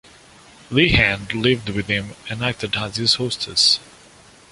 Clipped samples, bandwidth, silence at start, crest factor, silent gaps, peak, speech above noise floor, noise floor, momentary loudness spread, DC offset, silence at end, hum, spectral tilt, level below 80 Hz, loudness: under 0.1%; 11.5 kHz; 0.7 s; 20 dB; none; -2 dBFS; 28 dB; -48 dBFS; 9 LU; under 0.1%; 0.7 s; none; -3.5 dB/octave; -40 dBFS; -18 LUFS